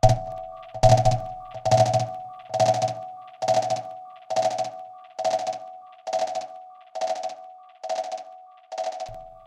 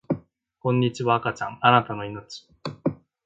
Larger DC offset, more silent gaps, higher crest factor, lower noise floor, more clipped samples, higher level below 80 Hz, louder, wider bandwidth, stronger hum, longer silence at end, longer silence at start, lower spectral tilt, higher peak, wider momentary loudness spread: neither; neither; about the same, 24 dB vs 22 dB; about the same, -46 dBFS vs -46 dBFS; neither; first, -40 dBFS vs -60 dBFS; about the same, -25 LUFS vs -24 LUFS; first, 12.5 kHz vs 7.8 kHz; neither; second, 0.05 s vs 0.3 s; about the same, 0.05 s vs 0.1 s; second, -5 dB/octave vs -6.5 dB/octave; about the same, -2 dBFS vs -2 dBFS; about the same, 20 LU vs 18 LU